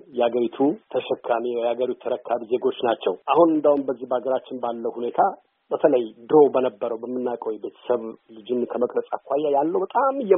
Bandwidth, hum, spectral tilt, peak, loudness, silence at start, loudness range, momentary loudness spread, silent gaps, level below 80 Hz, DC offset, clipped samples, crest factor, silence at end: 3.8 kHz; none; -4.5 dB/octave; -2 dBFS; -23 LUFS; 0.1 s; 3 LU; 10 LU; none; -72 dBFS; under 0.1%; under 0.1%; 20 dB; 0 s